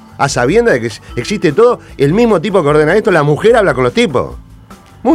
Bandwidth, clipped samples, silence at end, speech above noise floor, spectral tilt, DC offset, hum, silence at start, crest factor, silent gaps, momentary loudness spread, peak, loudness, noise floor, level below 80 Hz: 13 kHz; under 0.1%; 0 s; 26 dB; -6 dB/octave; under 0.1%; none; 0.2 s; 12 dB; none; 9 LU; 0 dBFS; -11 LUFS; -37 dBFS; -36 dBFS